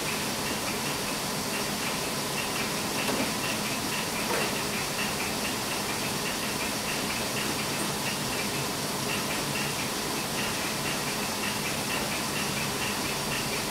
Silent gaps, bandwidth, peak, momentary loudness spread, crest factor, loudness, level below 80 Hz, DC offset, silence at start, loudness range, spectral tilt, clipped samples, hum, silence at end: none; 16 kHz; -16 dBFS; 1 LU; 14 dB; -28 LUFS; -54 dBFS; under 0.1%; 0 s; 1 LU; -2.5 dB/octave; under 0.1%; none; 0 s